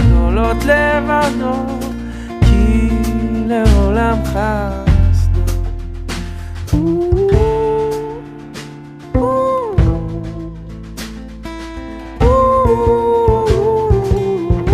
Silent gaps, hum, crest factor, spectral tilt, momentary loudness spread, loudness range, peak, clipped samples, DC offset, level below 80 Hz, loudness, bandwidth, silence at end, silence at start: none; none; 14 dB; -7.5 dB/octave; 16 LU; 5 LU; 0 dBFS; under 0.1%; under 0.1%; -20 dBFS; -15 LUFS; 14.5 kHz; 0 s; 0 s